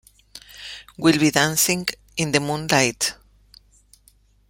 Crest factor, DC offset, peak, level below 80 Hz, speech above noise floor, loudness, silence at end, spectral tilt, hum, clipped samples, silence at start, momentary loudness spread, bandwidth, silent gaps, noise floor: 22 dB; under 0.1%; -2 dBFS; -54 dBFS; 37 dB; -20 LUFS; 1.35 s; -3 dB/octave; 50 Hz at -55 dBFS; under 0.1%; 0.35 s; 19 LU; 16.5 kHz; none; -57 dBFS